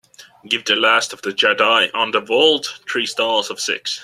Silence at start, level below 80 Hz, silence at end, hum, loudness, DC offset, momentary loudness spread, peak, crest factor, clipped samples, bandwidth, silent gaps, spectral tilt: 0.2 s; -70 dBFS; 0 s; none; -17 LUFS; under 0.1%; 8 LU; 0 dBFS; 18 dB; under 0.1%; 14 kHz; none; -1 dB/octave